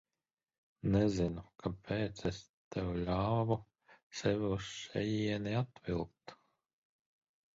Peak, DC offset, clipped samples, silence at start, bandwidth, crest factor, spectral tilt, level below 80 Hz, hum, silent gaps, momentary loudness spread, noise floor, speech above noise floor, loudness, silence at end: -18 dBFS; under 0.1%; under 0.1%; 0.85 s; 7.6 kHz; 20 dB; -6.5 dB/octave; -54 dBFS; none; 2.49-2.71 s, 4.03-4.10 s; 11 LU; under -90 dBFS; over 54 dB; -37 LUFS; 1.2 s